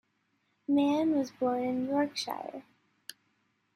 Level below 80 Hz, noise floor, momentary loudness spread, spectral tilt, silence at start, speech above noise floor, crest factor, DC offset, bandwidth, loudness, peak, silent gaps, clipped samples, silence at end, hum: -78 dBFS; -75 dBFS; 21 LU; -4.5 dB/octave; 0.7 s; 46 dB; 16 dB; under 0.1%; 13.5 kHz; -30 LUFS; -18 dBFS; none; under 0.1%; 1.15 s; none